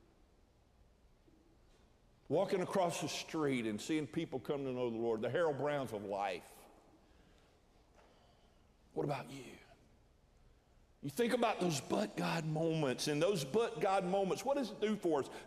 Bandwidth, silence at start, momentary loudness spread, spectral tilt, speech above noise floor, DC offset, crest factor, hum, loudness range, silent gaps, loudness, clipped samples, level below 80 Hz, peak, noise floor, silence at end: 15.5 kHz; 2.3 s; 8 LU; -5 dB/octave; 32 dB; under 0.1%; 20 dB; none; 13 LU; none; -37 LUFS; under 0.1%; -70 dBFS; -20 dBFS; -69 dBFS; 0 s